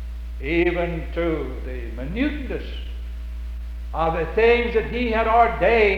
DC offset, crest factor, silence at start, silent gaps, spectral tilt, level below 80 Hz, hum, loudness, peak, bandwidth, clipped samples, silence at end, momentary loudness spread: under 0.1%; 18 dB; 0 s; none; -7.5 dB/octave; -30 dBFS; none; -22 LUFS; -4 dBFS; 6.4 kHz; under 0.1%; 0 s; 17 LU